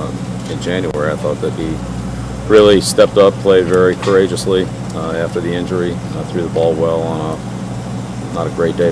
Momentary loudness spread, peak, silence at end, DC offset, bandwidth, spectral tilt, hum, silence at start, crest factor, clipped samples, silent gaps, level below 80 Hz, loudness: 14 LU; 0 dBFS; 0 s; under 0.1%; 11 kHz; -5.5 dB/octave; none; 0 s; 14 dB; under 0.1%; none; -36 dBFS; -15 LUFS